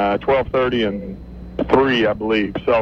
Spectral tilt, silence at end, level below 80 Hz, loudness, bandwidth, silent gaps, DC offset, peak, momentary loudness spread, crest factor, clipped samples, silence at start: -7 dB/octave; 0 s; -38 dBFS; -18 LUFS; 6.8 kHz; none; under 0.1%; -2 dBFS; 15 LU; 16 dB; under 0.1%; 0 s